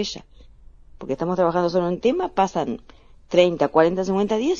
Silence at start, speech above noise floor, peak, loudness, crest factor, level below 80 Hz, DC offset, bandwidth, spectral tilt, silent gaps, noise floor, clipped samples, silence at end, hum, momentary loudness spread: 0 s; 25 dB; -2 dBFS; -21 LUFS; 20 dB; -50 dBFS; under 0.1%; 7.4 kHz; -6 dB/octave; none; -46 dBFS; under 0.1%; 0 s; none; 12 LU